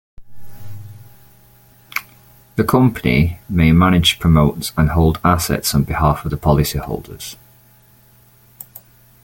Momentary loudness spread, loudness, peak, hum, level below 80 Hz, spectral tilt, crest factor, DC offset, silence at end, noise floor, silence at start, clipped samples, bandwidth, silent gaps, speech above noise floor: 24 LU; -16 LUFS; 0 dBFS; none; -32 dBFS; -5.5 dB/octave; 18 dB; under 0.1%; 0.45 s; -50 dBFS; 0.2 s; under 0.1%; 17 kHz; none; 35 dB